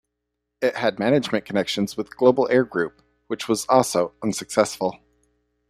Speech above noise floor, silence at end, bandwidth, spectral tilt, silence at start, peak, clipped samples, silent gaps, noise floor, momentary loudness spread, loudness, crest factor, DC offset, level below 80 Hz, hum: 58 dB; 0.75 s; 15.5 kHz; -4.5 dB/octave; 0.6 s; -2 dBFS; under 0.1%; none; -80 dBFS; 9 LU; -22 LUFS; 20 dB; under 0.1%; -62 dBFS; 60 Hz at -55 dBFS